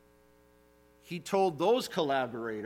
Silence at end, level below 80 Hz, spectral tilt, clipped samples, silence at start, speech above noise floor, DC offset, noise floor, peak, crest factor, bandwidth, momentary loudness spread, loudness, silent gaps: 0 s; -72 dBFS; -5 dB/octave; under 0.1%; 1.05 s; 32 dB; under 0.1%; -63 dBFS; -16 dBFS; 18 dB; 16.5 kHz; 12 LU; -30 LUFS; none